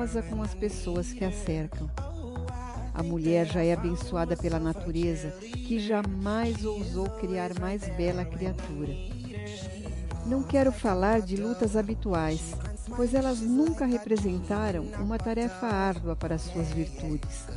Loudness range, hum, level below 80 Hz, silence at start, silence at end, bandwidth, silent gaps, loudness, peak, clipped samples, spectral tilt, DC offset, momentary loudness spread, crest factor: 5 LU; none; -38 dBFS; 0 s; 0 s; 11.5 kHz; none; -30 LUFS; -12 dBFS; under 0.1%; -6.5 dB/octave; under 0.1%; 11 LU; 18 dB